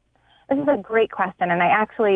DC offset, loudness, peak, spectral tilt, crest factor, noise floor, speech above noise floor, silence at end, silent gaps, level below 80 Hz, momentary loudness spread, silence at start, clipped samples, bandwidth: under 0.1%; -21 LUFS; -6 dBFS; -8.5 dB/octave; 16 dB; -53 dBFS; 33 dB; 0 s; none; -60 dBFS; 5 LU; 0.5 s; under 0.1%; 3.8 kHz